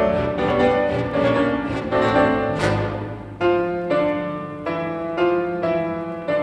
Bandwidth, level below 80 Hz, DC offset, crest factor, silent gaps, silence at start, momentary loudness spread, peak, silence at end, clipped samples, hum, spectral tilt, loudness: 10.5 kHz; -44 dBFS; under 0.1%; 16 dB; none; 0 s; 9 LU; -6 dBFS; 0 s; under 0.1%; none; -7 dB/octave; -21 LUFS